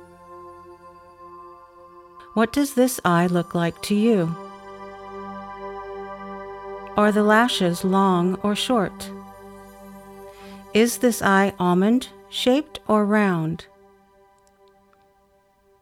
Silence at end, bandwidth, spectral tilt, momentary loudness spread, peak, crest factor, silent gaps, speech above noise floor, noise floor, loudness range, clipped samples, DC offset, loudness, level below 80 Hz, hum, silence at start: 2.2 s; 16.5 kHz; -5.5 dB/octave; 24 LU; -6 dBFS; 18 dB; none; 41 dB; -60 dBFS; 5 LU; under 0.1%; under 0.1%; -21 LUFS; -56 dBFS; none; 0 s